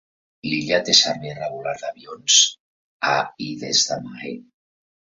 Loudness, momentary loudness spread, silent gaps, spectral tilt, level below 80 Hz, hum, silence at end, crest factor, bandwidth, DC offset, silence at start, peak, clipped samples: -19 LUFS; 19 LU; 2.60-3.00 s; -1 dB/octave; -64 dBFS; none; 0.6 s; 22 dB; 8.2 kHz; under 0.1%; 0.45 s; 0 dBFS; under 0.1%